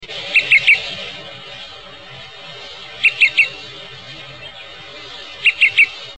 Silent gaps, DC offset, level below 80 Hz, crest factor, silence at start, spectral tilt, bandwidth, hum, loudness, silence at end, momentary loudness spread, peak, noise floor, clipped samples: none; 0.4%; -56 dBFS; 16 dB; 0 s; -1 dB/octave; 9.4 kHz; none; -13 LUFS; 0.05 s; 22 LU; -2 dBFS; -36 dBFS; under 0.1%